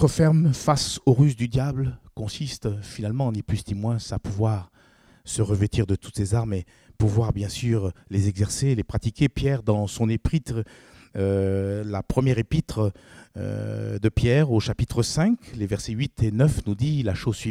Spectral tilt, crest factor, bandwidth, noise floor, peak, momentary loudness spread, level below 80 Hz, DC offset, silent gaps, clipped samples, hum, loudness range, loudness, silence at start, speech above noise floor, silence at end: -6.5 dB/octave; 18 dB; 14.5 kHz; -56 dBFS; -6 dBFS; 10 LU; -42 dBFS; under 0.1%; none; under 0.1%; none; 4 LU; -24 LUFS; 0 s; 33 dB; 0 s